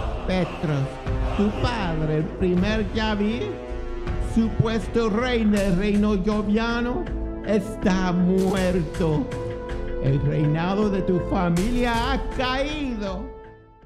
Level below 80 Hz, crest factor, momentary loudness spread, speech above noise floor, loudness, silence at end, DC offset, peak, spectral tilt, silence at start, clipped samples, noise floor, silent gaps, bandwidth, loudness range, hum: -32 dBFS; 18 dB; 9 LU; 22 dB; -24 LUFS; 0.3 s; under 0.1%; -6 dBFS; -7 dB/octave; 0 s; under 0.1%; -44 dBFS; none; 14 kHz; 2 LU; none